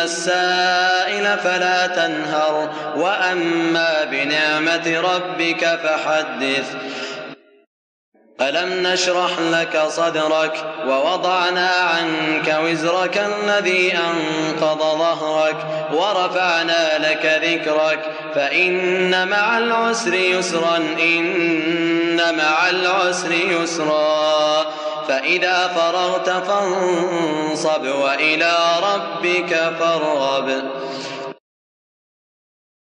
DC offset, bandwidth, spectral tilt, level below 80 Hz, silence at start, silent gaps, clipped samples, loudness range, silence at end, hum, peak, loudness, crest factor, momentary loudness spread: under 0.1%; 10.5 kHz; -3 dB/octave; -80 dBFS; 0 s; 7.67-8.12 s; under 0.1%; 4 LU; 1.55 s; none; -4 dBFS; -18 LUFS; 14 dB; 5 LU